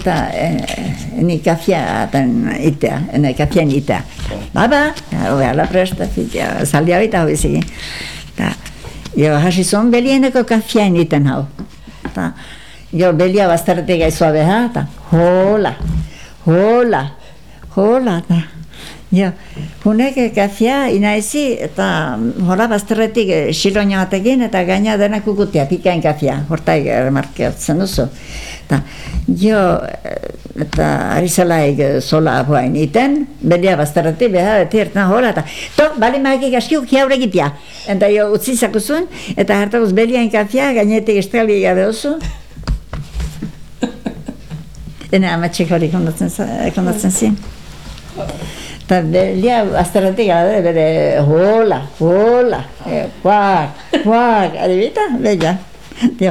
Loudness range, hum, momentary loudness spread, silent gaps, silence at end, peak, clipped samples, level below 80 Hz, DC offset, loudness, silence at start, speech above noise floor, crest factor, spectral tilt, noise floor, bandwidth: 4 LU; none; 13 LU; none; 0 s; -2 dBFS; under 0.1%; -34 dBFS; 2%; -14 LUFS; 0 s; 23 dB; 12 dB; -6 dB/octave; -37 dBFS; 16 kHz